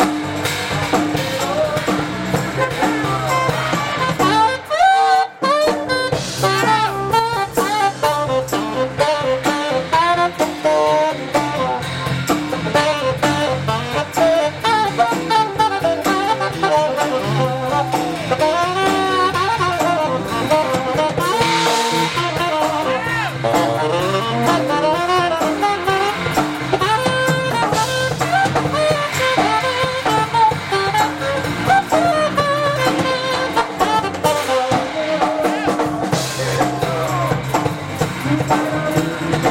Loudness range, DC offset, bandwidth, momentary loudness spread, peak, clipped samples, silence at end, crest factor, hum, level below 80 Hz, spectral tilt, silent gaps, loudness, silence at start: 2 LU; under 0.1%; 16.5 kHz; 5 LU; -4 dBFS; under 0.1%; 0 s; 14 dB; none; -46 dBFS; -4.5 dB/octave; none; -17 LUFS; 0 s